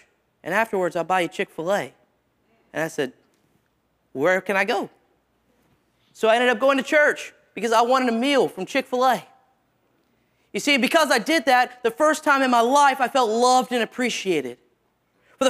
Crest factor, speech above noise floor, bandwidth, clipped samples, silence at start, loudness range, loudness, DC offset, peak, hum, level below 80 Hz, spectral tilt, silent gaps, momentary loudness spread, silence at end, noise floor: 18 dB; 48 dB; 16 kHz; under 0.1%; 0.45 s; 8 LU; -21 LUFS; under 0.1%; -4 dBFS; none; -72 dBFS; -3 dB/octave; none; 12 LU; 0 s; -68 dBFS